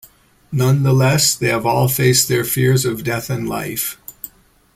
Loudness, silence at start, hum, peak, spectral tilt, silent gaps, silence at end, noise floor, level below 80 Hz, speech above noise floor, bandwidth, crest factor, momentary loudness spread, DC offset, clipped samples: -16 LUFS; 0.5 s; none; 0 dBFS; -4.5 dB/octave; none; 0.5 s; -47 dBFS; -48 dBFS; 31 dB; 16 kHz; 16 dB; 12 LU; under 0.1%; under 0.1%